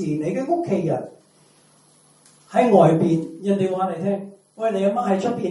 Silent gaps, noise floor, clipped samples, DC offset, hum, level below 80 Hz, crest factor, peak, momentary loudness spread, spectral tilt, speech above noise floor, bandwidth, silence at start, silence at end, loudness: none; -55 dBFS; under 0.1%; under 0.1%; none; -66 dBFS; 20 dB; -2 dBFS; 12 LU; -8 dB/octave; 36 dB; 11.5 kHz; 0 s; 0 s; -21 LUFS